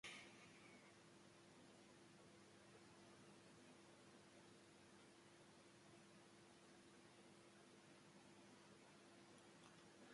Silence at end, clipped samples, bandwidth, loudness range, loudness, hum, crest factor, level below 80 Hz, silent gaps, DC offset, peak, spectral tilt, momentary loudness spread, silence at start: 0 s; under 0.1%; 11.5 kHz; 1 LU; -67 LUFS; none; 22 dB; under -90 dBFS; none; under 0.1%; -46 dBFS; -3.5 dB/octave; 2 LU; 0.05 s